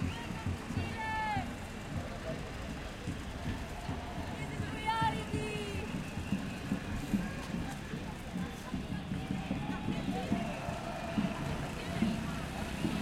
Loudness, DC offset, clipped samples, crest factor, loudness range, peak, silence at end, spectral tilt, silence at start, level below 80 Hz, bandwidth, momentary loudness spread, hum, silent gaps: -38 LUFS; under 0.1%; under 0.1%; 20 dB; 3 LU; -18 dBFS; 0 s; -5.5 dB/octave; 0 s; -48 dBFS; 16.5 kHz; 7 LU; none; none